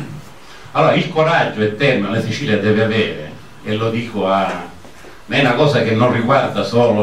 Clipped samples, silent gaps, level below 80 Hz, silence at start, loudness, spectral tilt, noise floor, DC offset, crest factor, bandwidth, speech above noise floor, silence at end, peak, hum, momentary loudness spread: under 0.1%; none; -52 dBFS; 0 s; -16 LUFS; -6.5 dB/octave; -39 dBFS; 1%; 14 dB; 13.5 kHz; 24 dB; 0 s; -2 dBFS; none; 14 LU